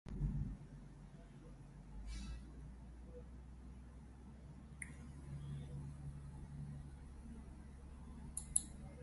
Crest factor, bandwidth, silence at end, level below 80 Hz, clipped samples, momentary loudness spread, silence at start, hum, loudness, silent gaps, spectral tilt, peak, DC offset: 32 dB; 11.5 kHz; 0 s; -54 dBFS; under 0.1%; 15 LU; 0.05 s; none; -50 LUFS; none; -4.5 dB/octave; -16 dBFS; under 0.1%